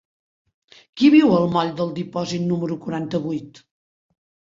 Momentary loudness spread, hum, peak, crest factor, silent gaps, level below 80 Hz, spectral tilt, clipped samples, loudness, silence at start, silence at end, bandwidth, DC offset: 13 LU; none; -4 dBFS; 18 dB; none; -62 dBFS; -7 dB/octave; under 0.1%; -20 LUFS; 0.95 s; 1.1 s; 7.6 kHz; under 0.1%